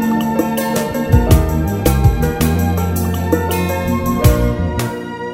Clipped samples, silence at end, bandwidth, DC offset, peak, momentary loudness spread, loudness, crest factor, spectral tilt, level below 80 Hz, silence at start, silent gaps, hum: under 0.1%; 0 s; 16.5 kHz; under 0.1%; 0 dBFS; 5 LU; -16 LUFS; 14 dB; -6.5 dB/octave; -22 dBFS; 0 s; none; none